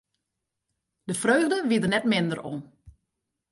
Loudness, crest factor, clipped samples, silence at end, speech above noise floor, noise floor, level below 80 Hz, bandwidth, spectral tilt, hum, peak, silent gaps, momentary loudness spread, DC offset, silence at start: -24 LUFS; 18 dB; under 0.1%; 0.6 s; 59 dB; -83 dBFS; -64 dBFS; 11.5 kHz; -4.5 dB/octave; none; -10 dBFS; none; 15 LU; under 0.1%; 1.05 s